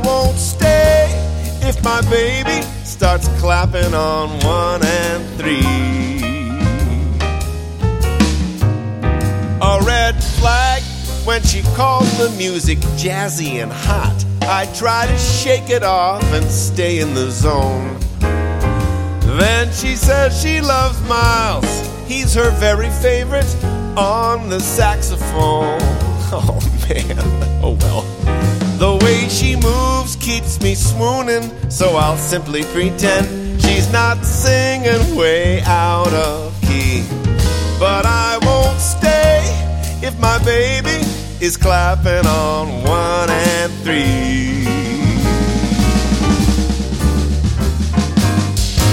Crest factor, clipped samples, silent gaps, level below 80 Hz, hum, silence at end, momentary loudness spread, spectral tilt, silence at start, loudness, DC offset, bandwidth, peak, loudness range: 14 dB; under 0.1%; none; -20 dBFS; none; 0 s; 6 LU; -5 dB/octave; 0 s; -15 LUFS; under 0.1%; 16.5 kHz; 0 dBFS; 2 LU